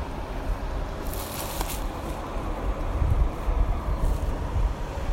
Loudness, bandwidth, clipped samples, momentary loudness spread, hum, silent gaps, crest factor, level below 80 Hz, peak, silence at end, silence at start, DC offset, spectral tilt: -30 LUFS; 16.5 kHz; under 0.1%; 6 LU; none; none; 16 dB; -28 dBFS; -10 dBFS; 0 s; 0 s; under 0.1%; -5.5 dB/octave